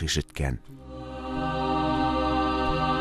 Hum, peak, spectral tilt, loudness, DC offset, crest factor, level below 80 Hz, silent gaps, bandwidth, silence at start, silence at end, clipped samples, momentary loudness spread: none; -12 dBFS; -5 dB/octave; -27 LUFS; under 0.1%; 16 dB; -36 dBFS; none; 14 kHz; 0 s; 0 s; under 0.1%; 14 LU